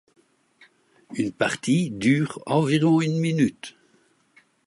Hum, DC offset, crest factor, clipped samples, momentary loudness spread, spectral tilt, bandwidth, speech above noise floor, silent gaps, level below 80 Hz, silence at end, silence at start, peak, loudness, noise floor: none; under 0.1%; 16 dB; under 0.1%; 11 LU; -6 dB/octave; 11.5 kHz; 41 dB; none; -64 dBFS; 0.95 s; 1.1 s; -8 dBFS; -23 LUFS; -63 dBFS